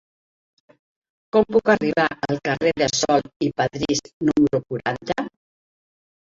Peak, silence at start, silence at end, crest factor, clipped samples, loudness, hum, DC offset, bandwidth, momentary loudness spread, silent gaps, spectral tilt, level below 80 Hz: -2 dBFS; 1.35 s; 1.1 s; 20 dB; under 0.1%; -21 LUFS; none; under 0.1%; 7.8 kHz; 8 LU; 3.36-3.40 s, 4.13-4.20 s; -4.5 dB/octave; -54 dBFS